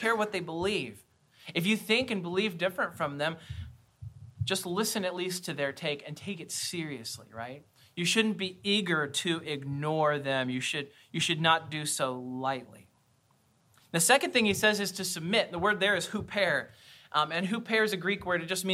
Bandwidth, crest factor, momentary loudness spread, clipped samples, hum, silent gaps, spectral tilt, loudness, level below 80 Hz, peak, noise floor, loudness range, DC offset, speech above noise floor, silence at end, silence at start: 16.5 kHz; 22 dB; 14 LU; under 0.1%; none; none; -3.5 dB/octave; -30 LUFS; -62 dBFS; -10 dBFS; -68 dBFS; 6 LU; under 0.1%; 38 dB; 0 s; 0 s